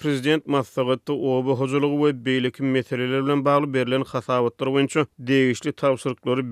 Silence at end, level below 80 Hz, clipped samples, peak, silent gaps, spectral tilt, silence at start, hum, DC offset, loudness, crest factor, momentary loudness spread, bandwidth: 0 s; -68 dBFS; under 0.1%; -8 dBFS; none; -6 dB/octave; 0 s; none; under 0.1%; -22 LUFS; 14 dB; 4 LU; 13.5 kHz